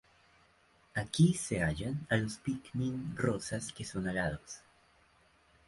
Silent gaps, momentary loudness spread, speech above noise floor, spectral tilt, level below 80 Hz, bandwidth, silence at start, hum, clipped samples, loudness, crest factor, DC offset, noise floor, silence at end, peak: none; 11 LU; 34 dB; -5.5 dB/octave; -56 dBFS; 11.5 kHz; 0.95 s; none; under 0.1%; -34 LUFS; 22 dB; under 0.1%; -67 dBFS; 1.1 s; -14 dBFS